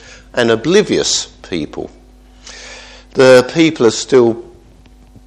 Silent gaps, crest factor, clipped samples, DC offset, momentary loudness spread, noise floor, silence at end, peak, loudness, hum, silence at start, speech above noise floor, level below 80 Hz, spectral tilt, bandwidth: none; 14 dB; 0.2%; under 0.1%; 23 LU; -42 dBFS; 0.85 s; 0 dBFS; -12 LUFS; none; 0.35 s; 31 dB; -44 dBFS; -4 dB/octave; 13 kHz